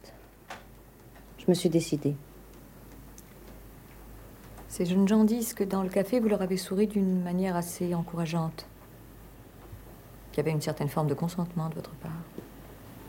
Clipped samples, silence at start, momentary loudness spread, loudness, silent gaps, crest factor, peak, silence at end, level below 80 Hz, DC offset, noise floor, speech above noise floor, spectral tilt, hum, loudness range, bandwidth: under 0.1%; 0.05 s; 24 LU; -29 LUFS; none; 20 dB; -12 dBFS; 0 s; -54 dBFS; under 0.1%; -52 dBFS; 24 dB; -6.5 dB/octave; none; 7 LU; 17 kHz